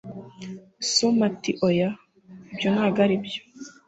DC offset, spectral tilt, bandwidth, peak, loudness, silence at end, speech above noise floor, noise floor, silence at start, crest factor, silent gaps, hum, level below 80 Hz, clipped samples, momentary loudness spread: under 0.1%; -4.5 dB/octave; 8.2 kHz; -8 dBFS; -23 LUFS; 0.15 s; 25 dB; -48 dBFS; 0.05 s; 18 dB; none; none; -64 dBFS; under 0.1%; 19 LU